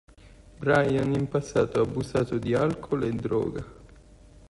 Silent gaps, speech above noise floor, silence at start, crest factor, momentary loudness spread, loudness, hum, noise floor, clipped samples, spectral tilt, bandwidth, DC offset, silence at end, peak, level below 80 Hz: none; 26 dB; 0.25 s; 18 dB; 8 LU; -26 LUFS; none; -52 dBFS; under 0.1%; -7 dB/octave; 11.5 kHz; under 0.1%; 0.05 s; -10 dBFS; -50 dBFS